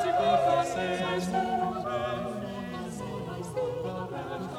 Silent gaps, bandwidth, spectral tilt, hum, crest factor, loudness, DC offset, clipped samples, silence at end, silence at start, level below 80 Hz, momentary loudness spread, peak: none; 15 kHz; -5.5 dB/octave; none; 18 dB; -30 LUFS; under 0.1%; under 0.1%; 0 s; 0 s; -56 dBFS; 12 LU; -12 dBFS